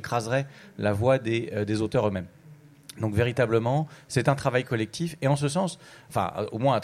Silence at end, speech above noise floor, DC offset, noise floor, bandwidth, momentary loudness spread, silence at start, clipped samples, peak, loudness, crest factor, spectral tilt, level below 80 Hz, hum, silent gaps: 0 s; 25 dB; under 0.1%; -51 dBFS; 15 kHz; 9 LU; 0 s; under 0.1%; -8 dBFS; -27 LUFS; 18 dB; -6 dB/octave; -56 dBFS; none; none